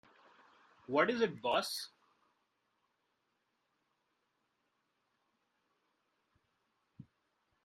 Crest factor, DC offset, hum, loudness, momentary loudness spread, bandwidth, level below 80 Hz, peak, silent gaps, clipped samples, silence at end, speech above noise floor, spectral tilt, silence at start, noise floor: 26 dB; under 0.1%; none; -35 LUFS; 11 LU; 11.5 kHz; -82 dBFS; -16 dBFS; none; under 0.1%; 0.6 s; 48 dB; -3.5 dB/octave; 0.9 s; -82 dBFS